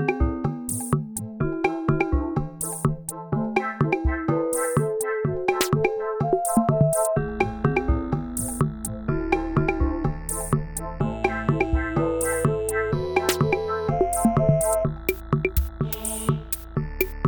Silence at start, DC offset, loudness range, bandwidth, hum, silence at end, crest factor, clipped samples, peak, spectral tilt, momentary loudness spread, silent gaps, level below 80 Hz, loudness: 0 s; under 0.1%; 3 LU; over 20 kHz; none; 0 s; 18 dB; under 0.1%; -6 dBFS; -5.5 dB/octave; 7 LU; none; -34 dBFS; -24 LUFS